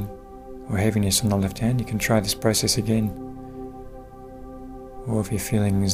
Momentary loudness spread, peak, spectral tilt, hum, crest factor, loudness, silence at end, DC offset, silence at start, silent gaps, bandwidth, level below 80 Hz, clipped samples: 21 LU; -6 dBFS; -4.5 dB/octave; none; 18 dB; -23 LUFS; 0 s; under 0.1%; 0 s; none; 16 kHz; -42 dBFS; under 0.1%